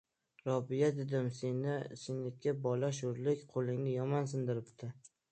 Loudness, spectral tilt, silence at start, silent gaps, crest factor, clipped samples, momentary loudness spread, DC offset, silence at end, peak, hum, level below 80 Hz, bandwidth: -37 LUFS; -7 dB/octave; 0.45 s; none; 18 dB; under 0.1%; 8 LU; under 0.1%; 0.25 s; -20 dBFS; none; -78 dBFS; 9 kHz